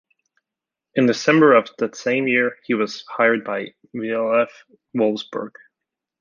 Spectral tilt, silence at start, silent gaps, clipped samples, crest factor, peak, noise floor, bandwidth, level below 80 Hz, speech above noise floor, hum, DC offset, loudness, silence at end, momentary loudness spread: -5.5 dB/octave; 0.95 s; none; under 0.1%; 18 dB; -2 dBFS; -87 dBFS; 7.4 kHz; -72 dBFS; 67 dB; none; under 0.1%; -20 LUFS; 0.7 s; 15 LU